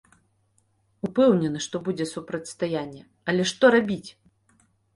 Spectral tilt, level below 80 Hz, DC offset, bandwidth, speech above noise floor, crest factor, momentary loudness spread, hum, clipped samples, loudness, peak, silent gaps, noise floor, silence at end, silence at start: -5 dB/octave; -64 dBFS; under 0.1%; 11.5 kHz; 44 dB; 20 dB; 15 LU; none; under 0.1%; -24 LUFS; -6 dBFS; none; -67 dBFS; 0.85 s; 1.05 s